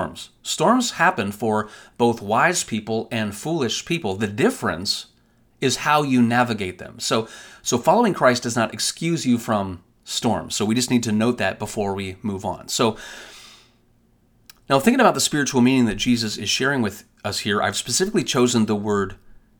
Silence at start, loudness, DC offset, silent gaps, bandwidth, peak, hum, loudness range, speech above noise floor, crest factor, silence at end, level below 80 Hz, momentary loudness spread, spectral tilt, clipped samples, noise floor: 0 s; -21 LUFS; under 0.1%; none; 19.5 kHz; -2 dBFS; none; 4 LU; 38 dB; 20 dB; 0.45 s; -52 dBFS; 10 LU; -4 dB/octave; under 0.1%; -59 dBFS